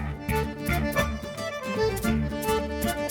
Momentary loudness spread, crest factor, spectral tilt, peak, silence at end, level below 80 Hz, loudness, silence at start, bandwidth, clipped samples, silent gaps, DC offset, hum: 6 LU; 16 dB; -5.5 dB/octave; -10 dBFS; 0 s; -36 dBFS; -28 LUFS; 0 s; over 20 kHz; under 0.1%; none; under 0.1%; none